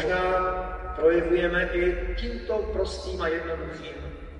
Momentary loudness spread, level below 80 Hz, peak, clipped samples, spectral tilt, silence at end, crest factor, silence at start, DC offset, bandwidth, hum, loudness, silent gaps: 11 LU; -36 dBFS; -10 dBFS; under 0.1%; -6 dB/octave; 0 s; 16 dB; 0 s; under 0.1%; 10 kHz; none; -27 LUFS; none